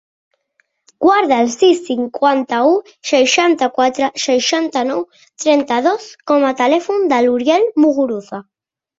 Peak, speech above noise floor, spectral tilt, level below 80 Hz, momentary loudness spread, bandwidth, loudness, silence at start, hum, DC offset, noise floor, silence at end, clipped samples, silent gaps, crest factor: -2 dBFS; 49 dB; -2.5 dB/octave; -62 dBFS; 8 LU; 7.8 kHz; -15 LUFS; 1 s; none; under 0.1%; -63 dBFS; 0.6 s; under 0.1%; none; 14 dB